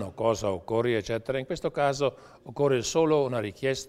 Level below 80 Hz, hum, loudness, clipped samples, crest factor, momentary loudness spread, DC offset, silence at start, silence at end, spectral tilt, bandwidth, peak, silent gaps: -56 dBFS; none; -27 LUFS; under 0.1%; 16 dB; 6 LU; under 0.1%; 0 s; 0 s; -5 dB/octave; 14.5 kHz; -10 dBFS; none